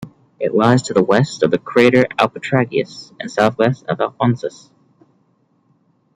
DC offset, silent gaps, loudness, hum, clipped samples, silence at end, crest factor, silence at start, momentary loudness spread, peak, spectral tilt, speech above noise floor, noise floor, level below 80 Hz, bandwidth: under 0.1%; none; -16 LUFS; none; under 0.1%; 1.65 s; 16 dB; 0 s; 11 LU; -2 dBFS; -6.5 dB/octave; 44 dB; -60 dBFS; -58 dBFS; 10.5 kHz